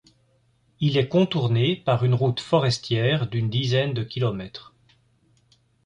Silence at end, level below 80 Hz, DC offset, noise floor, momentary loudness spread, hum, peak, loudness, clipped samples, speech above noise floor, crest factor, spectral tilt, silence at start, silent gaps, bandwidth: 1.25 s; -56 dBFS; under 0.1%; -64 dBFS; 6 LU; none; -6 dBFS; -23 LUFS; under 0.1%; 42 dB; 18 dB; -6.5 dB/octave; 0.8 s; none; 10 kHz